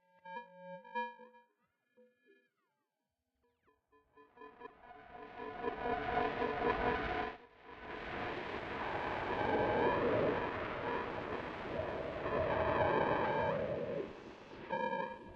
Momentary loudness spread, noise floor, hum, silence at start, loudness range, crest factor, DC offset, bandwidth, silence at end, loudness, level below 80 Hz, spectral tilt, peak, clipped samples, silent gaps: 19 LU; -88 dBFS; none; 0.25 s; 14 LU; 20 dB; under 0.1%; 7.4 kHz; 0 s; -37 LUFS; -60 dBFS; -7 dB/octave; -20 dBFS; under 0.1%; none